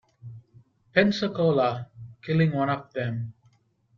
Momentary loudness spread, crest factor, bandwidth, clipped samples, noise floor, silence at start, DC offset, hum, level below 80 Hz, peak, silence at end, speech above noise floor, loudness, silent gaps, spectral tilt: 21 LU; 24 dB; 7 kHz; under 0.1%; -64 dBFS; 0.25 s; under 0.1%; none; -64 dBFS; -4 dBFS; 0.65 s; 40 dB; -25 LUFS; none; -7.5 dB/octave